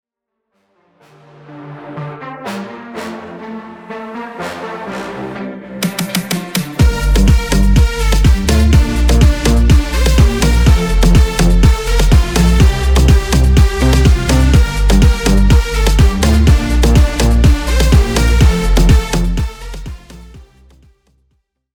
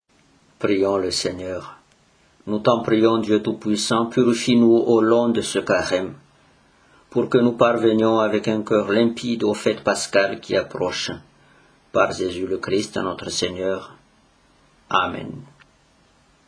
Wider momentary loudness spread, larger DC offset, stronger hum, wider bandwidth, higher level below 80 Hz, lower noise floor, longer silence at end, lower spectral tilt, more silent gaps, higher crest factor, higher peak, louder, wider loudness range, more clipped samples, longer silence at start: first, 16 LU vs 11 LU; neither; neither; first, 18 kHz vs 10.5 kHz; first, -14 dBFS vs -58 dBFS; first, -75 dBFS vs -58 dBFS; first, 1.35 s vs 1.05 s; about the same, -5.5 dB/octave vs -4.5 dB/octave; neither; second, 12 dB vs 20 dB; about the same, 0 dBFS vs -2 dBFS; first, -12 LUFS vs -20 LUFS; first, 15 LU vs 7 LU; neither; first, 1.5 s vs 0.6 s